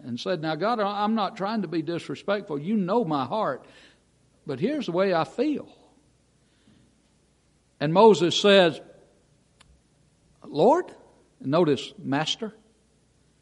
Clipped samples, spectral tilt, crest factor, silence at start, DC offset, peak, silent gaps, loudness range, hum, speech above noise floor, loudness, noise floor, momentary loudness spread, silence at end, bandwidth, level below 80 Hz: under 0.1%; -5.5 dB/octave; 22 dB; 0.05 s; under 0.1%; -4 dBFS; none; 7 LU; none; 41 dB; -24 LUFS; -64 dBFS; 15 LU; 0.9 s; 11 kHz; -70 dBFS